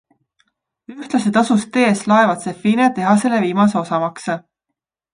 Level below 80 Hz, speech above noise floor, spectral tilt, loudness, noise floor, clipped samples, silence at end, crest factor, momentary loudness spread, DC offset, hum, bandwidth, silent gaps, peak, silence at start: -64 dBFS; 64 dB; -5.5 dB/octave; -16 LUFS; -80 dBFS; under 0.1%; 0.75 s; 16 dB; 9 LU; under 0.1%; none; 10.5 kHz; none; 0 dBFS; 0.9 s